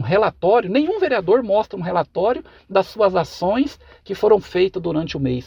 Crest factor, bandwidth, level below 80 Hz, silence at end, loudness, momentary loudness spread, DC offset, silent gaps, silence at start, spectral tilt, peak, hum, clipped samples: 16 dB; 13 kHz; -48 dBFS; 0.05 s; -19 LUFS; 6 LU; under 0.1%; none; 0 s; -7 dB/octave; -2 dBFS; none; under 0.1%